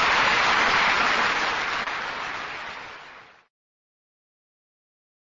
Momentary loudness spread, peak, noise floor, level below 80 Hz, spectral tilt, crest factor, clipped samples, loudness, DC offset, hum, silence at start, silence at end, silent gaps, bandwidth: 17 LU; -8 dBFS; -47 dBFS; -54 dBFS; -1.5 dB/octave; 18 dB; under 0.1%; -22 LUFS; under 0.1%; none; 0 s; 2.1 s; none; 8 kHz